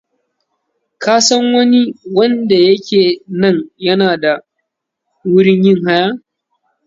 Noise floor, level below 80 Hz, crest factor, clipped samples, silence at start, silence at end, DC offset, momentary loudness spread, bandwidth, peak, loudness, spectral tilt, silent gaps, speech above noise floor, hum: -74 dBFS; -60 dBFS; 14 dB; under 0.1%; 1 s; 0.7 s; under 0.1%; 7 LU; 7.8 kHz; 0 dBFS; -12 LUFS; -4.5 dB/octave; none; 63 dB; none